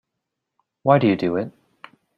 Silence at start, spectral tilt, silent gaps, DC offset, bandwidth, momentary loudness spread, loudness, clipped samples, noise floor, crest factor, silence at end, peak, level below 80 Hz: 0.85 s; -9 dB/octave; none; under 0.1%; 7 kHz; 11 LU; -20 LUFS; under 0.1%; -81 dBFS; 20 dB; 0.7 s; -2 dBFS; -62 dBFS